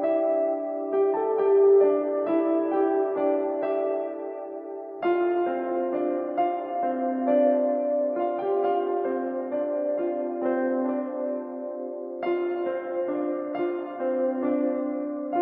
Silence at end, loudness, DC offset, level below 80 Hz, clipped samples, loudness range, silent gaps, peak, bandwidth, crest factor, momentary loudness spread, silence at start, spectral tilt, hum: 0 s; -26 LUFS; under 0.1%; under -90 dBFS; under 0.1%; 6 LU; none; -10 dBFS; 3.8 kHz; 14 dB; 9 LU; 0 s; -9.5 dB/octave; none